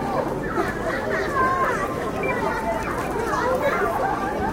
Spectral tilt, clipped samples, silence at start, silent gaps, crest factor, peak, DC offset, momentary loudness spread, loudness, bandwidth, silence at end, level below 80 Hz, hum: -5.5 dB/octave; under 0.1%; 0 s; none; 14 dB; -8 dBFS; under 0.1%; 4 LU; -23 LUFS; 17 kHz; 0 s; -40 dBFS; none